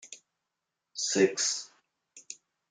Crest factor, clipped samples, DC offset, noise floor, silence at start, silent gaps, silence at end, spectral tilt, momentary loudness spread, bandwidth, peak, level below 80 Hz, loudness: 22 dB; under 0.1%; under 0.1%; -86 dBFS; 0.05 s; none; 0.35 s; -2 dB/octave; 23 LU; 9.8 kHz; -12 dBFS; -84 dBFS; -28 LUFS